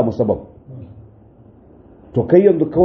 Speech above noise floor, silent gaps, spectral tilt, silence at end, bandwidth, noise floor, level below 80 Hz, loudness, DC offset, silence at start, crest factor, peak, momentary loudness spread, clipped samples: 31 dB; none; -10 dB/octave; 0 s; 5.8 kHz; -46 dBFS; -48 dBFS; -16 LUFS; under 0.1%; 0 s; 18 dB; 0 dBFS; 25 LU; under 0.1%